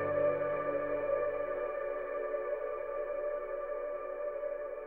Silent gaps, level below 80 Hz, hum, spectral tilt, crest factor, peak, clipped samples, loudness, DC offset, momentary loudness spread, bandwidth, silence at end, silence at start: none; -60 dBFS; none; -8.5 dB/octave; 14 dB; -20 dBFS; under 0.1%; -36 LUFS; under 0.1%; 7 LU; 3.6 kHz; 0 s; 0 s